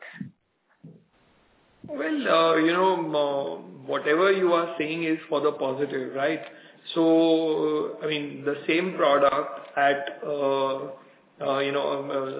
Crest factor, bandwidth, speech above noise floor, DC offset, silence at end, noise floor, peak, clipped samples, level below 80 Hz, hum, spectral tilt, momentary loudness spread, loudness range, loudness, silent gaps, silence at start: 16 dB; 4 kHz; 44 dB; under 0.1%; 0 s; -69 dBFS; -10 dBFS; under 0.1%; -76 dBFS; none; -9 dB/octave; 13 LU; 2 LU; -25 LUFS; none; 0 s